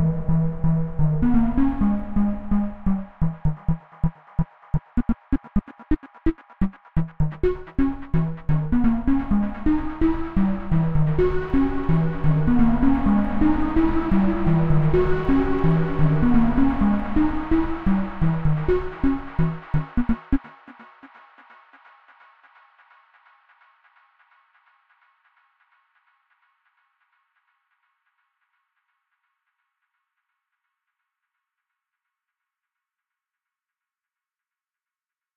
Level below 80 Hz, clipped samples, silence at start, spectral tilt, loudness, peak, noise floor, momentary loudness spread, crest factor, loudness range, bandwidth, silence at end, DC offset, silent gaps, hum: -32 dBFS; under 0.1%; 0 s; -10.5 dB/octave; -23 LUFS; -6 dBFS; under -90 dBFS; 8 LU; 16 dB; 7 LU; 4.5 kHz; 14.3 s; under 0.1%; none; none